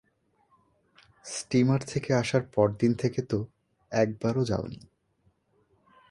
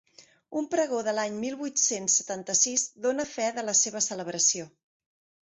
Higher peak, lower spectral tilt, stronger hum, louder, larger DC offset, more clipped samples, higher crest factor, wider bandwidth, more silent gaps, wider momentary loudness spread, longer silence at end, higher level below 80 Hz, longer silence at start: about the same, -10 dBFS vs -10 dBFS; first, -6.5 dB/octave vs -1.5 dB/octave; neither; about the same, -28 LUFS vs -26 LUFS; neither; neither; about the same, 20 dB vs 18 dB; first, 11.5 kHz vs 8.4 kHz; neither; first, 14 LU vs 8 LU; first, 1.3 s vs 0.75 s; first, -58 dBFS vs -74 dBFS; first, 1.25 s vs 0.2 s